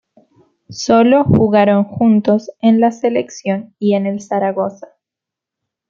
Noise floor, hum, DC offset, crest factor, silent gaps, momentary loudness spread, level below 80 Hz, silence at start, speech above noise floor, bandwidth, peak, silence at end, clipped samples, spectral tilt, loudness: -84 dBFS; none; under 0.1%; 14 dB; none; 10 LU; -50 dBFS; 0.7 s; 71 dB; 7.4 kHz; -2 dBFS; 1.05 s; under 0.1%; -7 dB/octave; -14 LUFS